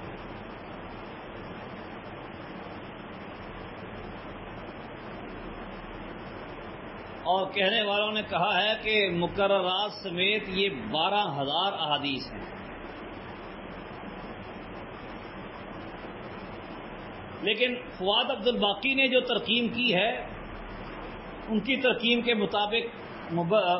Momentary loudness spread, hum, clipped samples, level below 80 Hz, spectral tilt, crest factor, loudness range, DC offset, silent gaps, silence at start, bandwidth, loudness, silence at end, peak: 17 LU; none; under 0.1%; -54 dBFS; -8.5 dB/octave; 18 dB; 15 LU; under 0.1%; none; 0 s; 5.8 kHz; -26 LUFS; 0 s; -12 dBFS